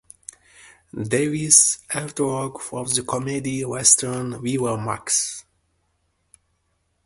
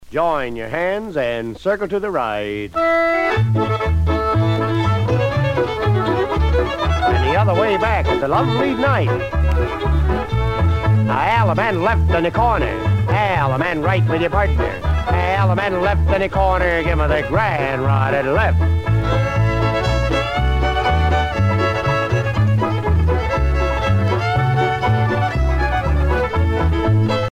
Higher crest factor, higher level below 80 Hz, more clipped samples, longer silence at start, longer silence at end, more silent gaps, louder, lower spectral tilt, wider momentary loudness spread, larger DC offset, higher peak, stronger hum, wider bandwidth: first, 24 dB vs 14 dB; second, -58 dBFS vs -24 dBFS; neither; first, 0.65 s vs 0 s; first, 1.65 s vs 0 s; neither; about the same, -20 LUFS vs -18 LUFS; second, -3 dB/octave vs -7.5 dB/octave; first, 19 LU vs 3 LU; neither; about the same, 0 dBFS vs -2 dBFS; neither; first, 12 kHz vs 9.4 kHz